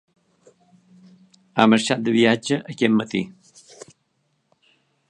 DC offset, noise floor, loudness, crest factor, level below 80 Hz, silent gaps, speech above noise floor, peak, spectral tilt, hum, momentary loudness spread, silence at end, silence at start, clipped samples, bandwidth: under 0.1%; -70 dBFS; -20 LUFS; 22 dB; -68 dBFS; none; 51 dB; 0 dBFS; -5 dB/octave; none; 11 LU; 1.8 s; 1.55 s; under 0.1%; 10 kHz